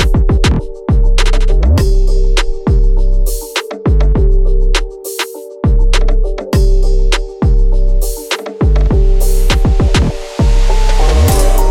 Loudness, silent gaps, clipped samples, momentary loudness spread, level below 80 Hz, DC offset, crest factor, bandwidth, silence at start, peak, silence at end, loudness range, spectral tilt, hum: -14 LUFS; none; under 0.1%; 6 LU; -10 dBFS; under 0.1%; 8 dB; 15.5 kHz; 0 s; 0 dBFS; 0 s; 2 LU; -5.5 dB/octave; none